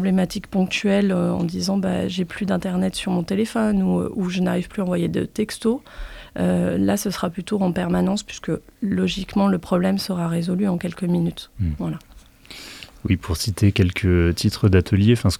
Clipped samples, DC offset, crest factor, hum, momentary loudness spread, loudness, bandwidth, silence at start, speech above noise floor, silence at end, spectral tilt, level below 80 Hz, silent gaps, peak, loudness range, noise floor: under 0.1%; under 0.1%; 18 dB; none; 9 LU; -22 LUFS; 15 kHz; 0 s; 22 dB; 0 s; -6.5 dB/octave; -42 dBFS; none; -2 dBFS; 2 LU; -43 dBFS